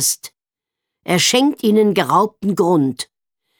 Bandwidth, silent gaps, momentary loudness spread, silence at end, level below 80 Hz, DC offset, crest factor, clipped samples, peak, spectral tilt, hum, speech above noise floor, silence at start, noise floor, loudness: over 20 kHz; none; 14 LU; 0.55 s; -64 dBFS; under 0.1%; 16 dB; under 0.1%; -2 dBFS; -3.5 dB/octave; none; 71 dB; 0 s; -86 dBFS; -16 LUFS